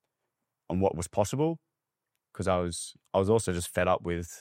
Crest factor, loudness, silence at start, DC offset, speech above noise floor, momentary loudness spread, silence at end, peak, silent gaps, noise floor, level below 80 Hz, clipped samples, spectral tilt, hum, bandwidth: 20 dB; -29 LUFS; 0.7 s; under 0.1%; 57 dB; 9 LU; 0 s; -12 dBFS; none; -85 dBFS; -54 dBFS; under 0.1%; -5.5 dB/octave; none; 16 kHz